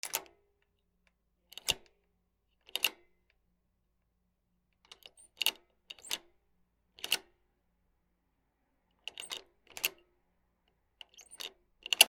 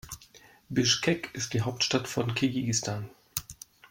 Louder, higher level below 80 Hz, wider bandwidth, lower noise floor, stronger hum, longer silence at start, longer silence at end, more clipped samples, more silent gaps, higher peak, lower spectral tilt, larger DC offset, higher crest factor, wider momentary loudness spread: second, -37 LUFS vs -29 LUFS; second, -74 dBFS vs -60 dBFS; about the same, 18 kHz vs 16.5 kHz; first, -79 dBFS vs -56 dBFS; neither; about the same, 0.05 s vs 0.05 s; second, 0 s vs 0.35 s; neither; neither; first, 0 dBFS vs -10 dBFS; second, 1.5 dB/octave vs -3.5 dB/octave; neither; first, 40 dB vs 22 dB; first, 21 LU vs 18 LU